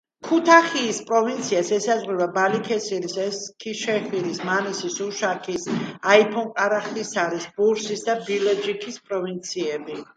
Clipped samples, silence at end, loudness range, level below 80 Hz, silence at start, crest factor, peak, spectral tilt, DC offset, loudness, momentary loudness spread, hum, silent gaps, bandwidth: under 0.1%; 0.15 s; 4 LU; -70 dBFS; 0.25 s; 22 dB; 0 dBFS; -3.5 dB/octave; under 0.1%; -23 LUFS; 11 LU; none; none; 9.4 kHz